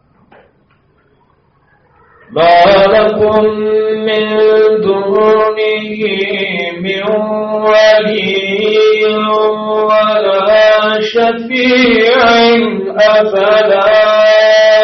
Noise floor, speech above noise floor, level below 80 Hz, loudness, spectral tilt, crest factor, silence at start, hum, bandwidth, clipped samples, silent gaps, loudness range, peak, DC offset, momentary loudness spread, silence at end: -52 dBFS; 43 dB; -46 dBFS; -9 LUFS; -2 dB/octave; 10 dB; 2.3 s; none; 6.4 kHz; under 0.1%; none; 3 LU; 0 dBFS; under 0.1%; 8 LU; 0 s